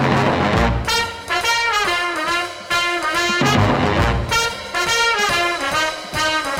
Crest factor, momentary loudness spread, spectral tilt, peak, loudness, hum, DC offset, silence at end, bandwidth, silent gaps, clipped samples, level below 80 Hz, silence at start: 18 dB; 5 LU; -3.5 dB/octave; 0 dBFS; -18 LUFS; none; under 0.1%; 0 s; 16.5 kHz; none; under 0.1%; -32 dBFS; 0 s